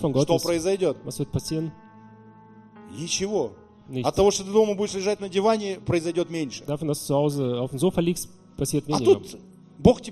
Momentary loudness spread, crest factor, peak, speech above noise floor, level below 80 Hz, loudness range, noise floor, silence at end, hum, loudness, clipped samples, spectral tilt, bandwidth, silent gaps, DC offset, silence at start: 11 LU; 22 dB; -2 dBFS; 25 dB; -48 dBFS; 4 LU; -49 dBFS; 0 s; none; -24 LUFS; under 0.1%; -5.5 dB/octave; 15 kHz; none; under 0.1%; 0 s